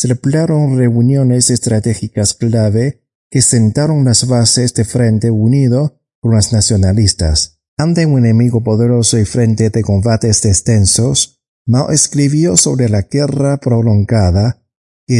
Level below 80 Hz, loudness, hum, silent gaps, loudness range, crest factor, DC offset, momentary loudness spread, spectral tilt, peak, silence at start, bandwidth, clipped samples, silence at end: -36 dBFS; -12 LUFS; none; 3.15-3.31 s, 6.15-6.22 s, 7.68-7.77 s, 11.48-11.65 s, 14.76-15.07 s; 1 LU; 12 dB; under 0.1%; 6 LU; -5 dB/octave; 0 dBFS; 0 s; 11.5 kHz; under 0.1%; 0 s